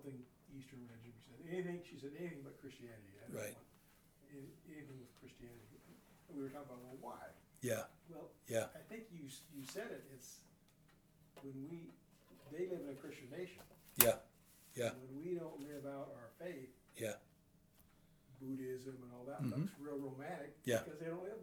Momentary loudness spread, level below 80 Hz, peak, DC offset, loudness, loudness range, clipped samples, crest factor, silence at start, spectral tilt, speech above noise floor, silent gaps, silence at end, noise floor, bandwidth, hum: 17 LU; -76 dBFS; -8 dBFS; under 0.1%; -45 LUFS; 15 LU; under 0.1%; 40 dB; 0 s; -4 dB/octave; 25 dB; none; 0 s; -71 dBFS; over 20 kHz; none